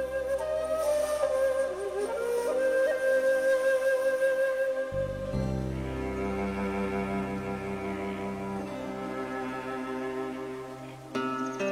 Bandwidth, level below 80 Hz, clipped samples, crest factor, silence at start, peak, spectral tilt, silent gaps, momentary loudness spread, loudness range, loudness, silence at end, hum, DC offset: 15 kHz; -48 dBFS; under 0.1%; 12 dB; 0 s; -18 dBFS; -6 dB/octave; none; 10 LU; 8 LU; -30 LUFS; 0 s; none; under 0.1%